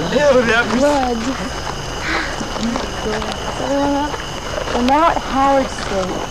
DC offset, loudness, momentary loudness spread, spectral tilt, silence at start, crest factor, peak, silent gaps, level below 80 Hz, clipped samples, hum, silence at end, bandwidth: 1%; -18 LUFS; 10 LU; -4 dB/octave; 0 s; 18 dB; 0 dBFS; none; -32 dBFS; under 0.1%; none; 0 s; 16 kHz